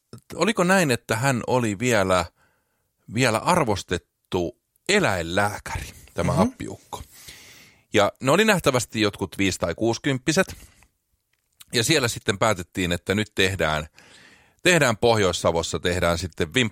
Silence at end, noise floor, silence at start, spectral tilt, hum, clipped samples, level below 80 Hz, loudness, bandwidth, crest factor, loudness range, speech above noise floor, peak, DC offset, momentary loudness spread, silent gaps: 0 s; -72 dBFS; 0.15 s; -4 dB/octave; none; under 0.1%; -48 dBFS; -22 LUFS; 16.5 kHz; 20 dB; 3 LU; 49 dB; -4 dBFS; under 0.1%; 14 LU; none